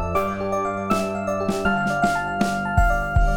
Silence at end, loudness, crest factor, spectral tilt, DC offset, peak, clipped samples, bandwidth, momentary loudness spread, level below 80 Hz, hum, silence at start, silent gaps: 0 s; -22 LUFS; 16 dB; -6 dB/octave; under 0.1%; -6 dBFS; under 0.1%; 18 kHz; 4 LU; -28 dBFS; none; 0 s; none